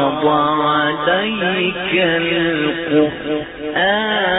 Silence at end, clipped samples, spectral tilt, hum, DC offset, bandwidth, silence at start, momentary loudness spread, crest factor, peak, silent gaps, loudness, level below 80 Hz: 0 s; under 0.1%; -8.5 dB/octave; none; under 0.1%; 4 kHz; 0 s; 4 LU; 14 dB; -4 dBFS; none; -16 LUFS; -48 dBFS